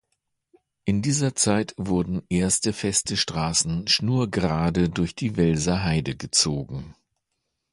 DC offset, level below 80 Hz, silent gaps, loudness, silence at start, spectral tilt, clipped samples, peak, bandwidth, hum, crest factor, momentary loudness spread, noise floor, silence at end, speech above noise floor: under 0.1%; -44 dBFS; none; -23 LUFS; 0.85 s; -4 dB/octave; under 0.1%; -6 dBFS; 11.5 kHz; none; 20 dB; 6 LU; -79 dBFS; 0.8 s; 55 dB